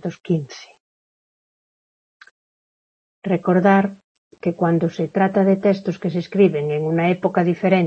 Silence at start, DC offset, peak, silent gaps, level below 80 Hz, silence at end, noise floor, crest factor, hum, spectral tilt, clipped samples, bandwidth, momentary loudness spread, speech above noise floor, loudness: 0 s; under 0.1%; -2 dBFS; 0.80-2.20 s, 2.31-3.22 s, 4.04-4.31 s; -66 dBFS; 0 s; under -90 dBFS; 18 dB; none; -8.5 dB/octave; under 0.1%; 6.8 kHz; 10 LU; over 72 dB; -19 LUFS